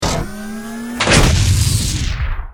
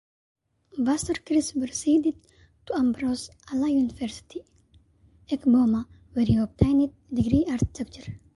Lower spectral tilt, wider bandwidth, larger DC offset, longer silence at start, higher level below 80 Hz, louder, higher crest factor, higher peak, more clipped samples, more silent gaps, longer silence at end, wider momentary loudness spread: second, -4 dB/octave vs -6 dB/octave; first, 18.5 kHz vs 11.5 kHz; neither; second, 0 s vs 0.75 s; first, -22 dBFS vs -44 dBFS; first, -15 LUFS vs -25 LUFS; about the same, 16 dB vs 20 dB; first, 0 dBFS vs -4 dBFS; neither; neither; second, 0 s vs 0.2 s; about the same, 15 LU vs 14 LU